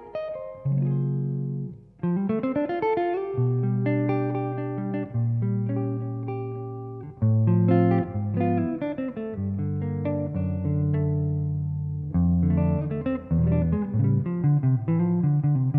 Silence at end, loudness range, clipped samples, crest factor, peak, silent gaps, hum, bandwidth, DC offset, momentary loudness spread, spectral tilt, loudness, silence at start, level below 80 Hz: 0 s; 4 LU; under 0.1%; 16 dB; -8 dBFS; none; none; 4.5 kHz; under 0.1%; 9 LU; -12.5 dB/octave; -26 LUFS; 0 s; -46 dBFS